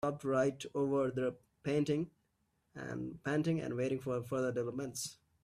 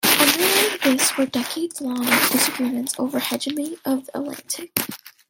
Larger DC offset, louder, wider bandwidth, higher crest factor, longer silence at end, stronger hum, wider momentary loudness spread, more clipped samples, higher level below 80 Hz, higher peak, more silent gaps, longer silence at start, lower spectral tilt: neither; second, -37 LUFS vs -20 LUFS; about the same, 15.5 kHz vs 17 kHz; second, 14 dB vs 22 dB; about the same, 0.3 s vs 0.2 s; neither; about the same, 11 LU vs 12 LU; neither; about the same, -70 dBFS vs -66 dBFS; second, -22 dBFS vs 0 dBFS; neither; about the same, 0 s vs 0 s; first, -6 dB/octave vs -1.5 dB/octave